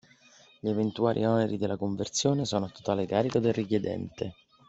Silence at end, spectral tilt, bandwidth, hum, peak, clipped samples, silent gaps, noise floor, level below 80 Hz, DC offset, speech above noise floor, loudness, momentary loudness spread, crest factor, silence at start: 0.35 s; -5.5 dB/octave; 8.2 kHz; none; -10 dBFS; under 0.1%; none; -58 dBFS; -64 dBFS; under 0.1%; 30 dB; -29 LUFS; 9 LU; 18 dB; 0.65 s